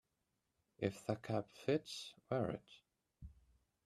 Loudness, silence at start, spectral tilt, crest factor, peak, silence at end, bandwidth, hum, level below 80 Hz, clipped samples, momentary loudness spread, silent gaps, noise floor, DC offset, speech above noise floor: -43 LUFS; 0.8 s; -6 dB/octave; 22 dB; -22 dBFS; 0.55 s; 13.5 kHz; none; -70 dBFS; under 0.1%; 21 LU; none; -86 dBFS; under 0.1%; 45 dB